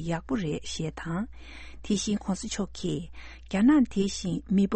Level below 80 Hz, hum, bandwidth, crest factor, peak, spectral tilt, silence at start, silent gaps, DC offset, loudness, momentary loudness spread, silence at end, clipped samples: -46 dBFS; none; 8.8 kHz; 16 dB; -12 dBFS; -5.5 dB/octave; 0 s; none; under 0.1%; -28 LUFS; 20 LU; 0 s; under 0.1%